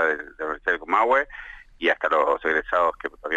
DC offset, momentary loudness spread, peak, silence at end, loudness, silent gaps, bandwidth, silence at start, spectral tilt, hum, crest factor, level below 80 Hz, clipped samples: under 0.1%; 13 LU; -8 dBFS; 0 s; -23 LUFS; none; 8 kHz; 0 s; -4 dB/octave; none; 16 dB; -52 dBFS; under 0.1%